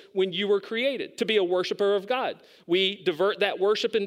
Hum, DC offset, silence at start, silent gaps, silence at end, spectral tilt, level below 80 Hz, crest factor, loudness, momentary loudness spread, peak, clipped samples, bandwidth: none; under 0.1%; 0.15 s; none; 0 s; -4.5 dB/octave; -82 dBFS; 16 dB; -26 LUFS; 5 LU; -10 dBFS; under 0.1%; 13.5 kHz